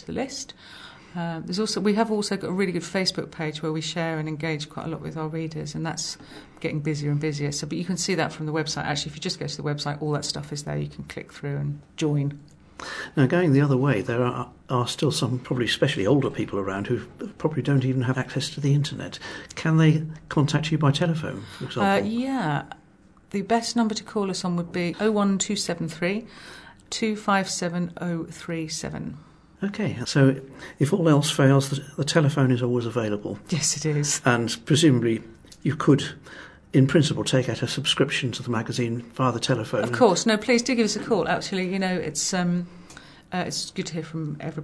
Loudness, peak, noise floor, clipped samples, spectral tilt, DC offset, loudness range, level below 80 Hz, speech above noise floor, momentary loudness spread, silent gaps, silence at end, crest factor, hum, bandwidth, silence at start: -25 LUFS; -2 dBFS; -54 dBFS; under 0.1%; -5 dB/octave; under 0.1%; 6 LU; -56 dBFS; 29 dB; 13 LU; none; 0 s; 22 dB; none; 11 kHz; 0 s